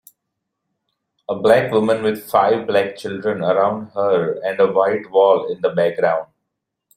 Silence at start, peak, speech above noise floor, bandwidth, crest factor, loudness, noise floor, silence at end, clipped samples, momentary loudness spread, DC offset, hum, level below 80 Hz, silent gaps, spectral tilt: 1.3 s; -2 dBFS; 61 dB; 16 kHz; 16 dB; -18 LUFS; -78 dBFS; 0.7 s; under 0.1%; 8 LU; under 0.1%; none; -62 dBFS; none; -6 dB/octave